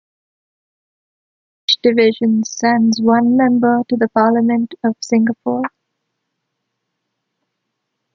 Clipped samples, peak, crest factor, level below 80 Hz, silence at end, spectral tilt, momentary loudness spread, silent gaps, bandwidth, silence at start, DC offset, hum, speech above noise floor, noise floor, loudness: under 0.1%; -2 dBFS; 16 dB; -62 dBFS; 2.45 s; -4.5 dB/octave; 8 LU; none; 7.6 kHz; 1.7 s; under 0.1%; none; 61 dB; -75 dBFS; -15 LUFS